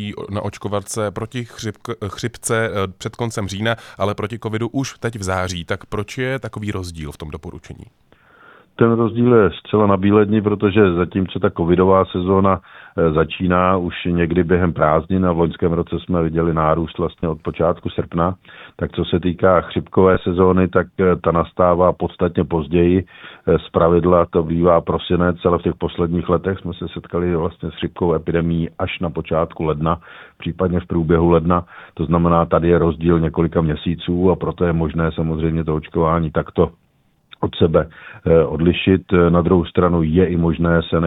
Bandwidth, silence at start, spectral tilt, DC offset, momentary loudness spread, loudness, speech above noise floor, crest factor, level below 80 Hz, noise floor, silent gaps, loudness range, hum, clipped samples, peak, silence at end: 12.5 kHz; 0 s; -7 dB/octave; under 0.1%; 11 LU; -18 LUFS; 31 dB; 18 dB; -38 dBFS; -49 dBFS; none; 7 LU; none; under 0.1%; 0 dBFS; 0 s